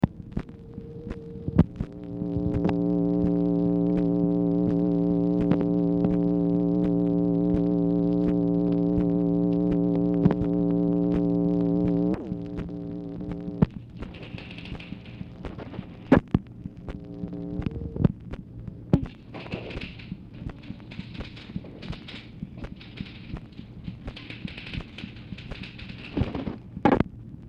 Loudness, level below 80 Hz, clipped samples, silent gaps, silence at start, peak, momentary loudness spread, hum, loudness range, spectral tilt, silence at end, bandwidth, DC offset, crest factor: -26 LUFS; -42 dBFS; under 0.1%; none; 0 s; -8 dBFS; 16 LU; none; 15 LU; -10 dB/octave; 0 s; 5.4 kHz; under 0.1%; 18 dB